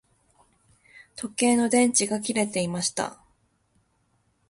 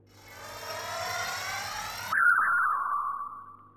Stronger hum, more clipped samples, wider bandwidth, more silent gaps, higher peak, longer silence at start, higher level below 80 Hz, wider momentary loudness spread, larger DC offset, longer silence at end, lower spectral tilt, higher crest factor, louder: neither; neither; second, 11.5 kHz vs 17 kHz; neither; first, -8 dBFS vs -12 dBFS; first, 0.95 s vs 0.15 s; about the same, -66 dBFS vs -64 dBFS; second, 14 LU vs 18 LU; neither; first, 1.35 s vs 0.1 s; first, -3.5 dB/octave vs -0.5 dB/octave; about the same, 20 dB vs 18 dB; first, -24 LUFS vs -28 LUFS